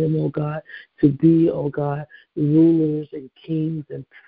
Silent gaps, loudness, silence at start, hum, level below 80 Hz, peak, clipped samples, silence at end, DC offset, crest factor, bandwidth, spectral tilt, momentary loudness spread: none; -20 LUFS; 0 s; none; -56 dBFS; -4 dBFS; under 0.1%; 0.25 s; under 0.1%; 16 dB; 4 kHz; -14 dB/octave; 19 LU